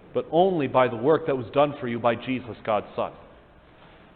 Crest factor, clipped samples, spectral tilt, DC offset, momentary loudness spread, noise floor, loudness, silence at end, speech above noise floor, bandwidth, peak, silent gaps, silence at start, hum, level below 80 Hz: 20 dB; under 0.1%; -10.5 dB/octave; under 0.1%; 9 LU; -52 dBFS; -24 LUFS; 0.9 s; 28 dB; 4.5 kHz; -6 dBFS; none; 0.15 s; none; -58 dBFS